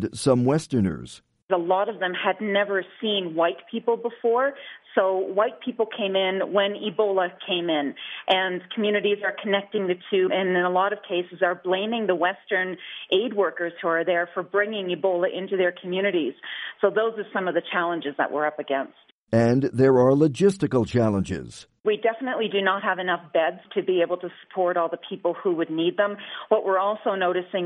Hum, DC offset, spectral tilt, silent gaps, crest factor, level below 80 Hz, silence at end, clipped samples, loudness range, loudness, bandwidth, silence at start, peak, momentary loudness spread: none; under 0.1%; -6 dB/octave; 1.42-1.48 s, 19.12-19.27 s, 21.80-21.84 s; 18 dB; -62 dBFS; 0 s; under 0.1%; 3 LU; -24 LUFS; 11 kHz; 0 s; -6 dBFS; 7 LU